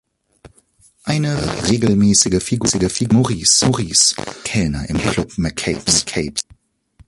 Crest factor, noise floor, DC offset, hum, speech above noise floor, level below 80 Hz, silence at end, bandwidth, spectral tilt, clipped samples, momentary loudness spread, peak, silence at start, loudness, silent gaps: 18 dB; -54 dBFS; under 0.1%; none; 37 dB; -38 dBFS; 0.65 s; 11.5 kHz; -3.5 dB/octave; under 0.1%; 10 LU; 0 dBFS; 0.45 s; -16 LUFS; none